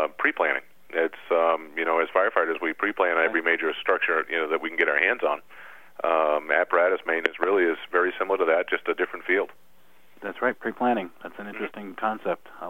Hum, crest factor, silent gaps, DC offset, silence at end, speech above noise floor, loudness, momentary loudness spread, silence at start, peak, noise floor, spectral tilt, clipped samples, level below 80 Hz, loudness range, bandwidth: none; 24 dB; none; 0.4%; 0 s; 36 dB; -25 LUFS; 10 LU; 0 s; -2 dBFS; -61 dBFS; -5.5 dB/octave; under 0.1%; -72 dBFS; 5 LU; 16 kHz